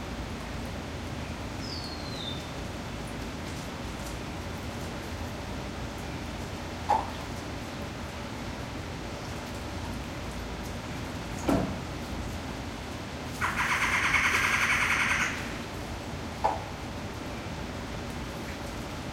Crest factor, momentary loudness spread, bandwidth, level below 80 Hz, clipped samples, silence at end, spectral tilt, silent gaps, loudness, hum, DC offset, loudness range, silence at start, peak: 22 dB; 13 LU; 16 kHz; -44 dBFS; under 0.1%; 0 s; -4 dB/octave; none; -32 LUFS; none; under 0.1%; 10 LU; 0 s; -12 dBFS